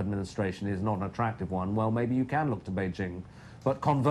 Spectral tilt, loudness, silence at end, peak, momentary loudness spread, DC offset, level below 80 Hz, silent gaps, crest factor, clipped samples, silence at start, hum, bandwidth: -8 dB/octave; -31 LUFS; 0 s; -12 dBFS; 7 LU; under 0.1%; -56 dBFS; none; 18 dB; under 0.1%; 0 s; none; 11 kHz